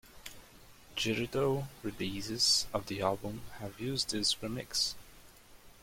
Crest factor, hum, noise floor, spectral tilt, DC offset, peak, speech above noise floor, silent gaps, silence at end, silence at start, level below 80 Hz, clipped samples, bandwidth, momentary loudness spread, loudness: 20 dB; none; -56 dBFS; -3 dB/octave; under 0.1%; -16 dBFS; 22 dB; none; 0.05 s; 0.05 s; -58 dBFS; under 0.1%; 16.5 kHz; 17 LU; -33 LUFS